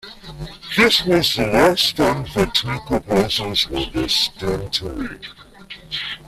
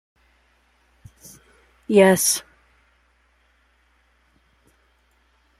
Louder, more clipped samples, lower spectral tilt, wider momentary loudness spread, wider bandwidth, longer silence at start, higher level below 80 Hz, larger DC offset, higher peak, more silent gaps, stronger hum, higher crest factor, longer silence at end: about the same, -18 LUFS vs -17 LUFS; neither; about the same, -4 dB/octave vs -3.5 dB/octave; second, 20 LU vs 29 LU; about the same, 15.5 kHz vs 16 kHz; second, 0.05 s vs 1.9 s; first, -40 dBFS vs -62 dBFS; neither; about the same, -2 dBFS vs -2 dBFS; neither; neither; second, 18 dB vs 24 dB; second, 0 s vs 3.2 s